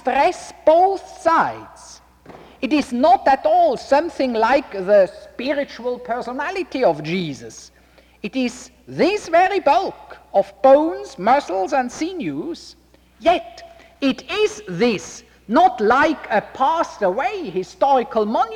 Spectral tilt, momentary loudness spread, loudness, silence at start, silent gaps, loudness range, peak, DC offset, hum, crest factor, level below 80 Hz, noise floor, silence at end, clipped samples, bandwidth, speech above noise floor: -5 dB/octave; 13 LU; -19 LUFS; 0.05 s; none; 6 LU; -4 dBFS; under 0.1%; none; 16 dB; -54 dBFS; -44 dBFS; 0 s; under 0.1%; 12.5 kHz; 25 dB